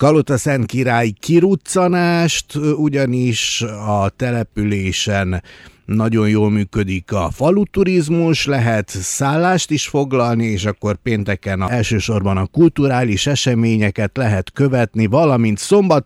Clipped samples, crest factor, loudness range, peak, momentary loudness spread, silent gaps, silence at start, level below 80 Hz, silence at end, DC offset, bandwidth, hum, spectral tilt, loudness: under 0.1%; 14 dB; 3 LU; -2 dBFS; 6 LU; none; 0 s; -42 dBFS; 0.05 s; under 0.1%; 14.5 kHz; none; -5.5 dB/octave; -16 LUFS